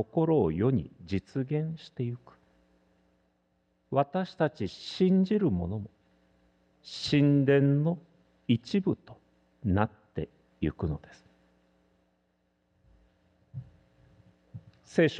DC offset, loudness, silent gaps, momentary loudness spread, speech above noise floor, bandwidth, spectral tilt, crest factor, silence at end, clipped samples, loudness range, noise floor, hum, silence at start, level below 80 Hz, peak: under 0.1%; -29 LUFS; none; 20 LU; 46 dB; 9 kHz; -8 dB/octave; 22 dB; 0 s; under 0.1%; 12 LU; -74 dBFS; none; 0 s; -56 dBFS; -10 dBFS